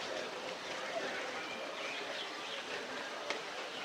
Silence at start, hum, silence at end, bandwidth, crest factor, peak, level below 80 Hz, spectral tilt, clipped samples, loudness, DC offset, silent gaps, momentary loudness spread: 0 s; none; 0 s; 16 kHz; 22 dB; -20 dBFS; -84 dBFS; -1.5 dB/octave; under 0.1%; -40 LUFS; under 0.1%; none; 3 LU